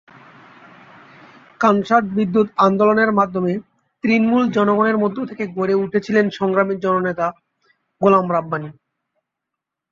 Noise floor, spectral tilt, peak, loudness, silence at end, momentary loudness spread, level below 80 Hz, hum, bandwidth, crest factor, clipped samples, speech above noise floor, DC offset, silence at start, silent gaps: -82 dBFS; -7.5 dB/octave; -2 dBFS; -18 LUFS; 1.2 s; 10 LU; -62 dBFS; none; 7.2 kHz; 16 dB; under 0.1%; 65 dB; under 0.1%; 1.6 s; none